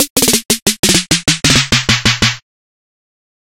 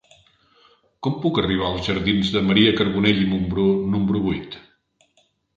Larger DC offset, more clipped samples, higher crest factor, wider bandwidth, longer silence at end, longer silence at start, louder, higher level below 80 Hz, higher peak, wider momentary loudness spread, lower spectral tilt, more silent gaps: neither; neither; second, 14 dB vs 20 dB; first, over 20 kHz vs 7.6 kHz; first, 1.2 s vs 1 s; second, 0 s vs 1 s; first, -11 LUFS vs -20 LUFS; first, -34 dBFS vs -44 dBFS; about the same, 0 dBFS vs -2 dBFS; second, 4 LU vs 11 LU; second, -2 dB/octave vs -7 dB/octave; first, 0.10-0.16 s, 0.62-0.66 s, 0.79-0.83 s vs none